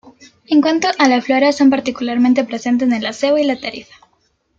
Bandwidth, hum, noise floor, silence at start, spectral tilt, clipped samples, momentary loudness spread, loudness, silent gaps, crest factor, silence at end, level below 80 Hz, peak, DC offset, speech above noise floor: 7.8 kHz; none; -62 dBFS; 0.5 s; -3.5 dB/octave; under 0.1%; 7 LU; -15 LUFS; none; 14 dB; 0.75 s; -58 dBFS; -2 dBFS; under 0.1%; 47 dB